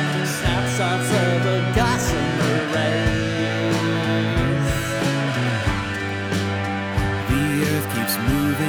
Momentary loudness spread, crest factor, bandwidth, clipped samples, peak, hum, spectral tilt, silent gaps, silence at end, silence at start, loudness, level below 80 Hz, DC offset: 4 LU; 16 dB; over 20 kHz; under 0.1%; -6 dBFS; none; -5 dB/octave; none; 0 s; 0 s; -21 LUFS; -34 dBFS; under 0.1%